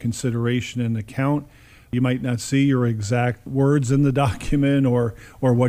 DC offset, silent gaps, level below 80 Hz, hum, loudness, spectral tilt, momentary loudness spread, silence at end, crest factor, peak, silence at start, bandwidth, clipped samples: under 0.1%; none; -42 dBFS; none; -21 LUFS; -7 dB/octave; 7 LU; 0 s; 14 dB; -6 dBFS; 0 s; 15 kHz; under 0.1%